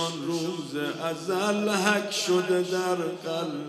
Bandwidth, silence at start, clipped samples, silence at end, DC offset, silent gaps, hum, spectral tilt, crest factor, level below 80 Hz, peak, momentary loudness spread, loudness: 14 kHz; 0 s; under 0.1%; 0 s; under 0.1%; none; none; -4 dB/octave; 20 dB; -78 dBFS; -6 dBFS; 7 LU; -27 LUFS